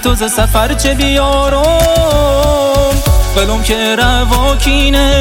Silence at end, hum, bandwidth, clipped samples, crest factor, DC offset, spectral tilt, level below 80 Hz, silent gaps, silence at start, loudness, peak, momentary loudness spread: 0 s; none; 17 kHz; under 0.1%; 10 dB; under 0.1%; -4 dB/octave; -14 dBFS; none; 0 s; -11 LUFS; 0 dBFS; 3 LU